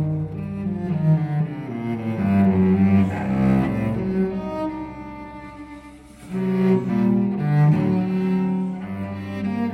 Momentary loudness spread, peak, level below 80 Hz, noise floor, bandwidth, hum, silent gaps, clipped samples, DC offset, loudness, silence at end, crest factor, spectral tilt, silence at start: 16 LU; -8 dBFS; -46 dBFS; -42 dBFS; 5 kHz; none; none; under 0.1%; under 0.1%; -22 LUFS; 0 s; 14 dB; -10 dB/octave; 0 s